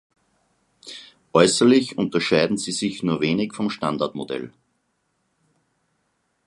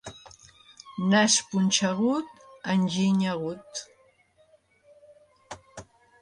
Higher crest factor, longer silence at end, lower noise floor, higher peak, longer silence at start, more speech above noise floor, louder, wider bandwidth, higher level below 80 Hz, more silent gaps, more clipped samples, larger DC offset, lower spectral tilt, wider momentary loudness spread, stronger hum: about the same, 22 dB vs 20 dB; first, 2 s vs 0.4 s; first, -71 dBFS vs -62 dBFS; first, 0 dBFS vs -8 dBFS; first, 0.85 s vs 0.05 s; first, 51 dB vs 38 dB; first, -21 LUFS vs -25 LUFS; about the same, 11.5 kHz vs 11 kHz; about the same, -62 dBFS vs -66 dBFS; neither; neither; neither; about the same, -4.5 dB/octave vs -4 dB/octave; about the same, 22 LU vs 24 LU; neither